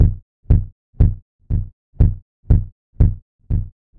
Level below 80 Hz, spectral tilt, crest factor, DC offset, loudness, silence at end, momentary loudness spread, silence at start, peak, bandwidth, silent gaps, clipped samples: -20 dBFS; -12.5 dB/octave; 16 dB; 0.1%; -20 LUFS; 0.3 s; 17 LU; 0 s; -2 dBFS; 2.2 kHz; 0.22-0.43 s, 0.72-0.93 s, 1.22-1.39 s, 1.73-1.93 s, 2.22-2.43 s, 2.72-2.93 s, 3.22-3.39 s; under 0.1%